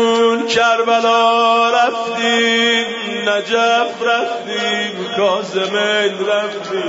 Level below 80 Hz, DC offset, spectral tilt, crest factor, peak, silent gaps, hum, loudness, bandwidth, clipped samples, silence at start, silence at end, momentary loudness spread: -64 dBFS; under 0.1%; -2.5 dB/octave; 12 dB; -4 dBFS; none; none; -15 LUFS; 8 kHz; under 0.1%; 0 s; 0 s; 7 LU